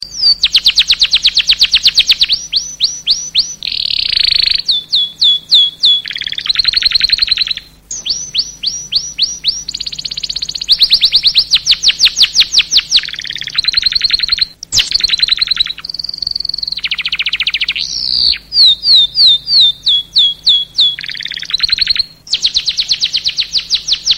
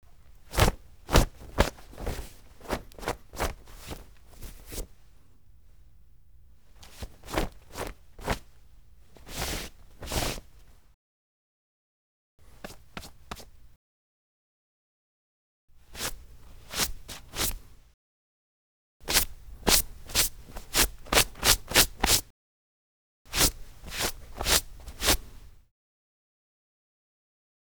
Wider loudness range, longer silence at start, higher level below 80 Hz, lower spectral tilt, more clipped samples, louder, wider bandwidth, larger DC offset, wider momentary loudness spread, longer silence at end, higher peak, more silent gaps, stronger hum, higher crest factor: second, 5 LU vs 25 LU; second, 0 s vs 0.5 s; about the same, -40 dBFS vs -40 dBFS; second, 2 dB/octave vs -2 dB/octave; neither; first, -10 LUFS vs -27 LUFS; about the same, over 20 kHz vs over 20 kHz; second, under 0.1% vs 0.2%; second, 10 LU vs 23 LU; second, 0 s vs 2.2 s; about the same, 0 dBFS vs -2 dBFS; second, none vs 10.94-12.38 s, 13.76-15.68 s, 17.94-19.00 s, 22.30-23.25 s; neither; second, 12 dB vs 30 dB